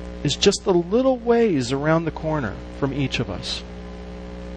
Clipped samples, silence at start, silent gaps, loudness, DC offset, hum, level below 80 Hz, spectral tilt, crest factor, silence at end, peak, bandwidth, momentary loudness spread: under 0.1%; 0 s; none; -22 LUFS; under 0.1%; 60 Hz at -40 dBFS; -38 dBFS; -5 dB/octave; 18 dB; 0 s; -4 dBFS; 9.8 kHz; 17 LU